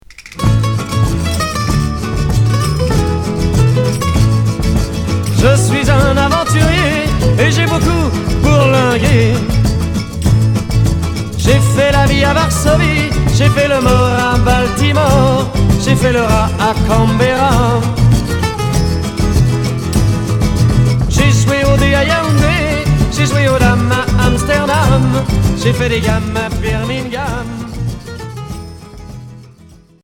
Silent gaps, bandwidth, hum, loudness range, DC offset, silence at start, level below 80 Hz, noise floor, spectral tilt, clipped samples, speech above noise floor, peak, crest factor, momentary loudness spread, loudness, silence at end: none; 17.5 kHz; none; 3 LU; under 0.1%; 0.1 s; -20 dBFS; -41 dBFS; -5.5 dB/octave; under 0.1%; 30 dB; 0 dBFS; 12 dB; 7 LU; -12 LUFS; 0.6 s